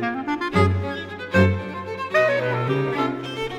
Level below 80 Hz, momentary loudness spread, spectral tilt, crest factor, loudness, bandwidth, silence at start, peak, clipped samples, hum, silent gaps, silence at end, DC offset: -50 dBFS; 10 LU; -7 dB/octave; 18 dB; -22 LUFS; 10.5 kHz; 0 s; -4 dBFS; under 0.1%; none; none; 0 s; under 0.1%